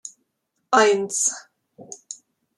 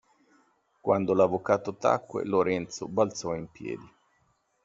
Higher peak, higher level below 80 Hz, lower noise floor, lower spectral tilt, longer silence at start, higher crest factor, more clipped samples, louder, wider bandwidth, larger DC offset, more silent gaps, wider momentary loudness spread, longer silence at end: first, -2 dBFS vs -8 dBFS; second, -78 dBFS vs -66 dBFS; first, -75 dBFS vs -71 dBFS; second, -1.5 dB/octave vs -6 dB/octave; second, 0.05 s vs 0.85 s; about the same, 22 dB vs 22 dB; neither; first, -19 LUFS vs -28 LUFS; first, 13 kHz vs 7.8 kHz; neither; neither; first, 24 LU vs 13 LU; second, 0.45 s vs 0.8 s